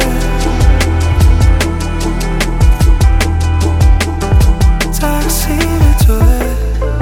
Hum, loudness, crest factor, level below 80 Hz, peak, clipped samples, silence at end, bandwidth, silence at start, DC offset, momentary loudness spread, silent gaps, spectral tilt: none; -12 LUFS; 10 dB; -12 dBFS; 0 dBFS; under 0.1%; 0 s; 17 kHz; 0 s; under 0.1%; 6 LU; none; -5.5 dB/octave